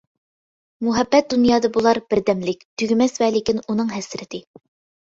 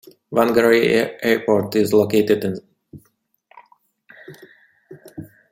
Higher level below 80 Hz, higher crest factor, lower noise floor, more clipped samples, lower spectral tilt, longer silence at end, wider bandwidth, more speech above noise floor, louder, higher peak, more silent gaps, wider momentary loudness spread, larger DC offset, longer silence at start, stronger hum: first, -54 dBFS vs -60 dBFS; about the same, 18 dB vs 18 dB; first, under -90 dBFS vs -64 dBFS; neither; about the same, -5 dB/octave vs -5.5 dB/octave; first, 0.65 s vs 0.25 s; second, 7.8 kHz vs 16 kHz; first, over 71 dB vs 47 dB; about the same, -19 LUFS vs -18 LUFS; about the same, -2 dBFS vs -2 dBFS; first, 2.65-2.77 s vs none; second, 13 LU vs 23 LU; neither; first, 0.8 s vs 0.3 s; neither